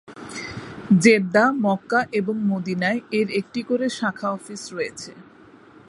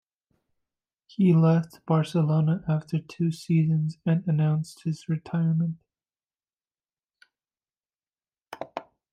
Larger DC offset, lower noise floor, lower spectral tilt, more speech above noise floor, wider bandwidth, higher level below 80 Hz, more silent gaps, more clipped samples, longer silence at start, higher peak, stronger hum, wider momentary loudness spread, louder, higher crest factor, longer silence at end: neither; second, -48 dBFS vs under -90 dBFS; second, -5.5 dB/octave vs -8.5 dB/octave; second, 27 dB vs over 66 dB; first, 11.5 kHz vs 9.2 kHz; first, -62 dBFS vs -68 dBFS; neither; neither; second, 0.1 s vs 1.2 s; first, -2 dBFS vs -10 dBFS; neither; about the same, 17 LU vs 16 LU; first, -21 LUFS vs -25 LUFS; first, 22 dB vs 16 dB; first, 0.65 s vs 0.3 s